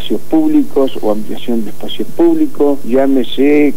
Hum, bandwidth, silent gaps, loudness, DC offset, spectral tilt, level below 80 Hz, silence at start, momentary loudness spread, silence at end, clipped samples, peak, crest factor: none; 16 kHz; none; -14 LUFS; 20%; -6 dB/octave; -46 dBFS; 0 s; 8 LU; 0 s; under 0.1%; 0 dBFS; 12 dB